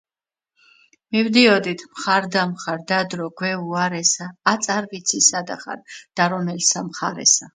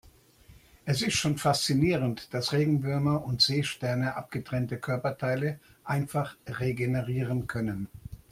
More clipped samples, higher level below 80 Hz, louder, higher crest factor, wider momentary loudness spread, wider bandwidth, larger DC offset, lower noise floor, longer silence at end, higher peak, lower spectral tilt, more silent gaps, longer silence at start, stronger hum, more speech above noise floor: neither; second, -70 dBFS vs -56 dBFS; first, -19 LUFS vs -29 LUFS; about the same, 20 dB vs 18 dB; first, 12 LU vs 9 LU; second, 11 kHz vs 16 kHz; neither; first, under -90 dBFS vs -56 dBFS; about the same, 0.05 s vs 0.15 s; first, 0 dBFS vs -10 dBFS; second, -2.5 dB/octave vs -5 dB/octave; neither; first, 1.1 s vs 0.05 s; neither; first, over 69 dB vs 28 dB